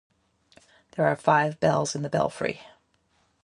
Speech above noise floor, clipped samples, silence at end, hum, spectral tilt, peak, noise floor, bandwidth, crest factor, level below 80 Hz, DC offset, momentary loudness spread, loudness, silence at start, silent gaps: 44 dB; under 0.1%; 0.8 s; none; -5 dB/octave; -6 dBFS; -68 dBFS; 11.5 kHz; 22 dB; -62 dBFS; under 0.1%; 11 LU; -25 LUFS; 0.95 s; none